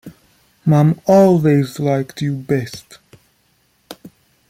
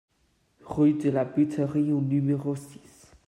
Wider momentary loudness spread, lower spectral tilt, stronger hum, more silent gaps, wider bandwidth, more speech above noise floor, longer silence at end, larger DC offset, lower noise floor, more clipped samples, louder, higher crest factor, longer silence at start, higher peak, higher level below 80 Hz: about the same, 12 LU vs 10 LU; about the same, -8 dB/octave vs -9 dB/octave; neither; neither; first, 15.5 kHz vs 11.5 kHz; about the same, 46 dB vs 44 dB; about the same, 0.55 s vs 0.5 s; neither; second, -60 dBFS vs -69 dBFS; neither; first, -15 LUFS vs -26 LUFS; about the same, 16 dB vs 14 dB; second, 0.05 s vs 0.65 s; first, -2 dBFS vs -12 dBFS; first, -56 dBFS vs -62 dBFS